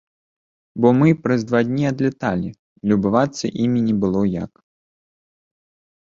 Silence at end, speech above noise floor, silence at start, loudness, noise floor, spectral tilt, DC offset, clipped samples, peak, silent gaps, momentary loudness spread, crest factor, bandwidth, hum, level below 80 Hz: 1.55 s; over 72 dB; 0.75 s; -19 LUFS; under -90 dBFS; -7.5 dB/octave; under 0.1%; under 0.1%; -2 dBFS; 2.59-2.76 s; 11 LU; 18 dB; 7.6 kHz; none; -52 dBFS